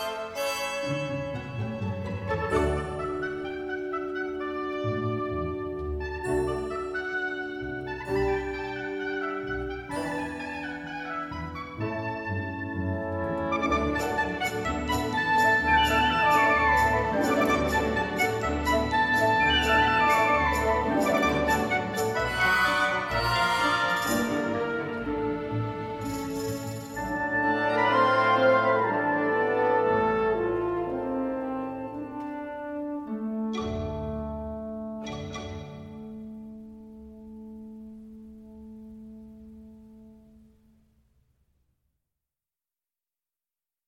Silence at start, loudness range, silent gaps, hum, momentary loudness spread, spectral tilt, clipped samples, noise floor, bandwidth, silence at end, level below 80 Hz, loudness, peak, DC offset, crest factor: 0 s; 14 LU; none; none; 15 LU; -5 dB/octave; under 0.1%; under -90 dBFS; 16.5 kHz; 3.7 s; -44 dBFS; -27 LUFS; -10 dBFS; under 0.1%; 18 dB